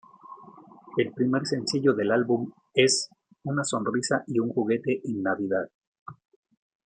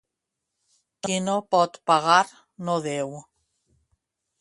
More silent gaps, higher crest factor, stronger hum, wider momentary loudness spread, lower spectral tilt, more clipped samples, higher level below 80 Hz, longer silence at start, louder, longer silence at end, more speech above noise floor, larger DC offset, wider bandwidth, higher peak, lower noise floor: first, 5.74-5.81 s, 5.87-5.93 s, 5.99-6.06 s vs none; about the same, 20 dB vs 22 dB; neither; first, 20 LU vs 16 LU; about the same, -4.5 dB/octave vs -4 dB/octave; neither; about the same, -72 dBFS vs -72 dBFS; second, 0.25 s vs 1.05 s; second, -26 LUFS vs -23 LUFS; second, 0.7 s vs 1.2 s; second, 24 dB vs 60 dB; neither; second, 9.6 kHz vs 11.5 kHz; about the same, -6 dBFS vs -4 dBFS; second, -50 dBFS vs -83 dBFS